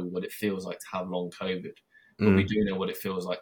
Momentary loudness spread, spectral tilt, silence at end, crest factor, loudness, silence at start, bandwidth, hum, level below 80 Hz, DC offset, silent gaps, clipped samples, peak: 12 LU; -6.5 dB/octave; 0 s; 20 dB; -29 LUFS; 0 s; 18 kHz; none; -58 dBFS; under 0.1%; none; under 0.1%; -8 dBFS